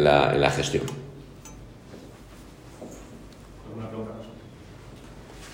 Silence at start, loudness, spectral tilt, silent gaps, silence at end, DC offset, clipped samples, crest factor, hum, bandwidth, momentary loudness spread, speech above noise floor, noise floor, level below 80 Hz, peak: 0 s; -25 LUFS; -5 dB/octave; none; 0 s; under 0.1%; under 0.1%; 24 dB; none; 16 kHz; 24 LU; 24 dB; -46 dBFS; -48 dBFS; -4 dBFS